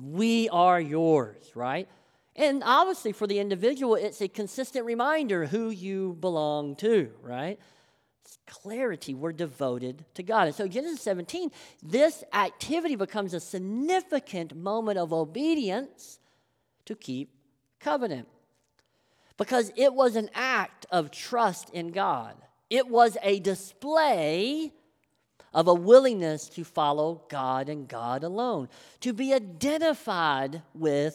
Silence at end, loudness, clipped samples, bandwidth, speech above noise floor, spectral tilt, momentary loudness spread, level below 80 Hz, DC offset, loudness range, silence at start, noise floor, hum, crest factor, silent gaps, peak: 0 s; -27 LUFS; under 0.1%; 15.5 kHz; 46 dB; -5 dB/octave; 13 LU; -76 dBFS; under 0.1%; 7 LU; 0 s; -73 dBFS; none; 22 dB; none; -6 dBFS